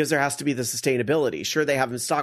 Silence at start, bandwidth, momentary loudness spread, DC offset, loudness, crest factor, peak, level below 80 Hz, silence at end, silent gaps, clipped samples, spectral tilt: 0 s; 13.5 kHz; 3 LU; under 0.1%; -24 LUFS; 18 dB; -6 dBFS; -64 dBFS; 0 s; none; under 0.1%; -4 dB/octave